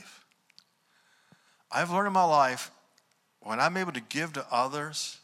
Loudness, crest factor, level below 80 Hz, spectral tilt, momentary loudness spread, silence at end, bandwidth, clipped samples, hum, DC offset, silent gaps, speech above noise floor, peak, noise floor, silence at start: -28 LUFS; 20 dB; -82 dBFS; -3.5 dB/octave; 12 LU; 0.05 s; 16 kHz; under 0.1%; none; under 0.1%; none; 41 dB; -10 dBFS; -69 dBFS; 0 s